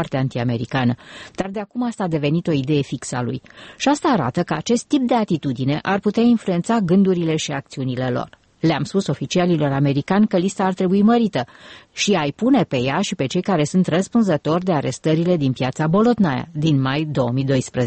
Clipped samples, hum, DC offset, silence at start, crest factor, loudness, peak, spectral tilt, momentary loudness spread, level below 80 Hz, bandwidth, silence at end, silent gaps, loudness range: under 0.1%; none; under 0.1%; 0 s; 12 dB; -20 LUFS; -6 dBFS; -6 dB/octave; 9 LU; -52 dBFS; 8.8 kHz; 0 s; none; 3 LU